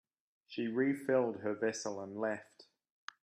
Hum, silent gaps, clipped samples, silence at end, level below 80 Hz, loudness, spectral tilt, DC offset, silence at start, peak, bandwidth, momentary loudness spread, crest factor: none; none; under 0.1%; 0.6 s; -84 dBFS; -36 LUFS; -5 dB/octave; under 0.1%; 0.5 s; -18 dBFS; 13.5 kHz; 14 LU; 18 dB